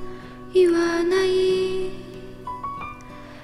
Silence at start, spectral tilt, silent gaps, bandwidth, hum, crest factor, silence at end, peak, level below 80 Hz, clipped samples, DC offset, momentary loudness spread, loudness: 0 s; -5 dB/octave; none; 12 kHz; none; 14 dB; 0 s; -8 dBFS; -46 dBFS; under 0.1%; under 0.1%; 20 LU; -22 LUFS